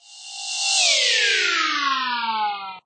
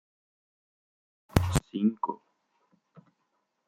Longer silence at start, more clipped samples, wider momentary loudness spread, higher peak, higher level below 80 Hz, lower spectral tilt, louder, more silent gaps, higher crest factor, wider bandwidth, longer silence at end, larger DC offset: second, 0.1 s vs 1.35 s; neither; first, 12 LU vs 9 LU; about the same, -6 dBFS vs -4 dBFS; second, -82 dBFS vs -46 dBFS; second, 3 dB/octave vs -6 dB/octave; first, -19 LUFS vs -30 LUFS; neither; second, 16 dB vs 30 dB; second, 9.4 kHz vs 16.5 kHz; second, 0.05 s vs 1.5 s; neither